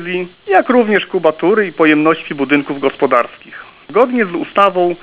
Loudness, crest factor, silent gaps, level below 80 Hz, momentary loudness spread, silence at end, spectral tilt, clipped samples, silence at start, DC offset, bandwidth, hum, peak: -14 LUFS; 14 dB; none; -60 dBFS; 10 LU; 0.05 s; -9.5 dB/octave; under 0.1%; 0 s; under 0.1%; 4 kHz; none; 0 dBFS